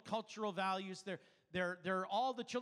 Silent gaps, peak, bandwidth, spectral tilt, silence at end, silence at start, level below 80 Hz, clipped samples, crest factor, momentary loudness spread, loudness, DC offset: none; -26 dBFS; 12 kHz; -4.5 dB/octave; 0 s; 0.05 s; -82 dBFS; under 0.1%; 14 dB; 9 LU; -41 LUFS; under 0.1%